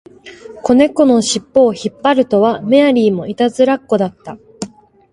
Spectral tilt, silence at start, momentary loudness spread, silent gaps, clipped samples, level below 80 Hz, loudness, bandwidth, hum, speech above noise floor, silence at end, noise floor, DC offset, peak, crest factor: -5 dB/octave; 0.25 s; 19 LU; none; under 0.1%; -52 dBFS; -13 LUFS; 11.5 kHz; none; 23 dB; 0.45 s; -35 dBFS; under 0.1%; 0 dBFS; 14 dB